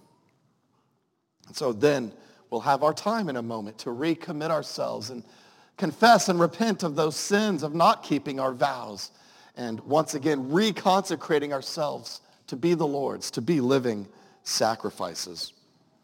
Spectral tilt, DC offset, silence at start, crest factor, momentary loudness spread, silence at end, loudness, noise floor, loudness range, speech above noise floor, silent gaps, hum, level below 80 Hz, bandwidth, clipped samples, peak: -4.5 dB/octave; under 0.1%; 1.55 s; 22 dB; 15 LU; 0.55 s; -26 LUFS; -74 dBFS; 5 LU; 48 dB; none; none; -76 dBFS; 17 kHz; under 0.1%; -4 dBFS